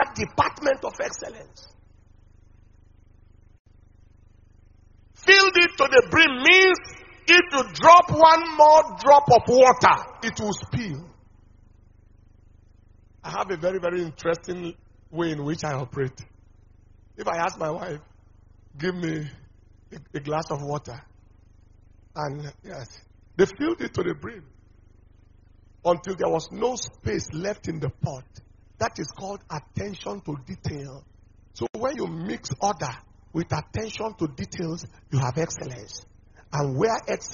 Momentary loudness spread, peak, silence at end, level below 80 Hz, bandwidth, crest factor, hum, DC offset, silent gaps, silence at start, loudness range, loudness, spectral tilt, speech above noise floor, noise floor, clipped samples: 22 LU; 0 dBFS; 0 s; -52 dBFS; 7.2 kHz; 22 dB; 50 Hz at -60 dBFS; under 0.1%; 3.59-3.65 s; 0 s; 18 LU; -21 LUFS; -2.5 dB/octave; 31 dB; -53 dBFS; under 0.1%